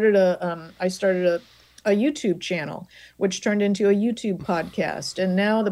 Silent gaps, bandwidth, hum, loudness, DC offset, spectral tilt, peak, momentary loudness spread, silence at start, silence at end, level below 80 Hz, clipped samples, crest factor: none; 12.5 kHz; none; -23 LUFS; under 0.1%; -5.5 dB/octave; -8 dBFS; 8 LU; 0 s; 0 s; -62 dBFS; under 0.1%; 14 dB